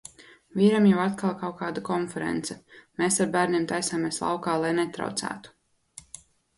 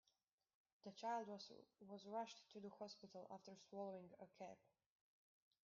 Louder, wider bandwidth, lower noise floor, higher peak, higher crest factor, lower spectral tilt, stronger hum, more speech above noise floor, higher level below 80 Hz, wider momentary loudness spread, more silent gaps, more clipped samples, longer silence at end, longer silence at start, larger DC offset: first, -26 LUFS vs -55 LUFS; first, 11.5 kHz vs 7.2 kHz; second, -51 dBFS vs -89 dBFS; first, -8 dBFS vs -38 dBFS; about the same, 18 dB vs 18 dB; first, -5 dB/octave vs -3.5 dB/octave; neither; second, 26 dB vs 34 dB; first, -64 dBFS vs under -90 dBFS; first, 21 LU vs 13 LU; neither; neither; about the same, 1.1 s vs 1.05 s; second, 0.55 s vs 0.85 s; neither